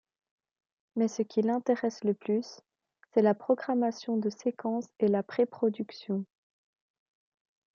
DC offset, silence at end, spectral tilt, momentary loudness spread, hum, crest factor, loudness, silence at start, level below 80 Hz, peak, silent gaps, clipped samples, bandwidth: under 0.1%; 1.5 s; -6.5 dB/octave; 9 LU; none; 18 dB; -30 LUFS; 0.95 s; -80 dBFS; -12 dBFS; none; under 0.1%; 7.4 kHz